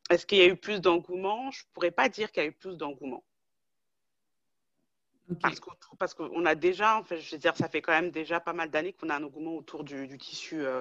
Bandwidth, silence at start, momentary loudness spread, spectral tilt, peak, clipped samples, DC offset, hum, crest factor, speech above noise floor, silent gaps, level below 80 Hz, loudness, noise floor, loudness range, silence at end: 7.8 kHz; 0.1 s; 15 LU; -4.5 dB/octave; -8 dBFS; under 0.1%; under 0.1%; none; 22 dB; 58 dB; none; -70 dBFS; -29 LUFS; -88 dBFS; 10 LU; 0 s